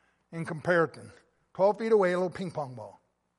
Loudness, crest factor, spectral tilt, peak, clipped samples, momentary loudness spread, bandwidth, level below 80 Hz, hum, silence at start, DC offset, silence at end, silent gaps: -28 LUFS; 18 dB; -7 dB/octave; -12 dBFS; under 0.1%; 20 LU; 11.5 kHz; -70 dBFS; none; 0.3 s; under 0.1%; 0.45 s; none